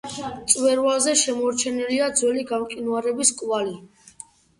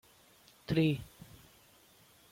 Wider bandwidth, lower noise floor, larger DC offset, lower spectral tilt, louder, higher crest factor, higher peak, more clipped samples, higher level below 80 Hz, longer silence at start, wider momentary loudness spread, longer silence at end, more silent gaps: second, 11.5 kHz vs 16.5 kHz; second, -47 dBFS vs -63 dBFS; neither; second, -1.5 dB/octave vs -7 dB/octave; first, -21 LUFS vs -33 LUFS; about the same, 22 dB vs 20 dB; first, -2 dBFS vs -18 dBFS; neither; about the same, -62 dBFS vs -62 dBFS; second, 0.05 s vs 0.7 s; second, 10 LU vs 25 LU; second, 0.75 s vs 1.25 s; neither